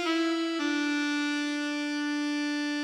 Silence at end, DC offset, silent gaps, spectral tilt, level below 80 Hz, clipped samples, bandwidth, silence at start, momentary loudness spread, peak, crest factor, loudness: 0 s; under 0.1%; none; -1 dB/octave; -88 dBFS; under 0.1%; 11.5 kHz; 0 s; 3 LU; -16 dBFS; 14 dB; -29 LUFS